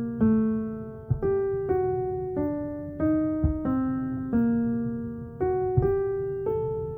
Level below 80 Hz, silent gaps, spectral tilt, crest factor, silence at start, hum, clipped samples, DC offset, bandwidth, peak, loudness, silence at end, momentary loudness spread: -42 dBFS; none; -13 dB/octave; 18 dB; 0 s; none; under 0.1%; under 0.1%; 2.8 kHz; -10 dBFS; -27 LUFS; 0 s; 8 LU